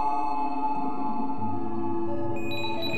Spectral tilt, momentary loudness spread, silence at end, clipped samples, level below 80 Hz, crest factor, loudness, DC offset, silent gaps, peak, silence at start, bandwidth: -6.5 dB/octave; 3 LU; 0 s; under 0.1%; -58 dBFS; 12 dB; -30 LUFS; 5%; none; -16 dBFS; 0 s; 13 kHz